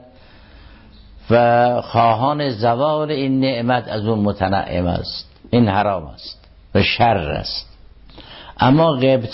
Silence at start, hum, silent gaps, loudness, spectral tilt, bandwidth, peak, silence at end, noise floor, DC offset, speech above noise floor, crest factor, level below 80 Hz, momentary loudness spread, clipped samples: 1.15 s; none; none; -17 LUFS; -10.5 dB/octave; 5.8 kHz; -4 dBFS; 0 s; -44 dBFS; under 0.1%; 28 dB; 14 dB; -40 dBFS; 13 LU; under 0.1%